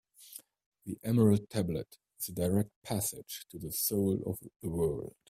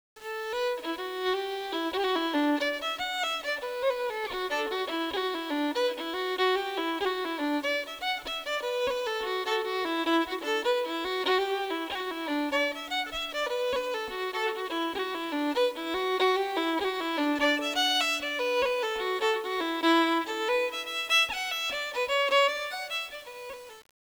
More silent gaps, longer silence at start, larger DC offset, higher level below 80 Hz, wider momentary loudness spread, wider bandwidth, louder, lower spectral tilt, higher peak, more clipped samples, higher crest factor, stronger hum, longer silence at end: first, 0.66-0.72 s, 2.76-2.82 s vs none; about the same, 0.2 s vs 0.15 s; neither; about the same, -60 dBFS vs -62 dBFS; first, 21 LU vs 8 LU; second, 16 kHz vs over 20 kHz; second, -33 LUFS vs -29 LUFS; first, -6 dB/octave vs -1.5 dB/octave; about the same, -14 dBFS vs -12 dBFS; neither; about the same, 20 dB vs 18 dB; neither; about the same, 0.2 s vs 0.2 s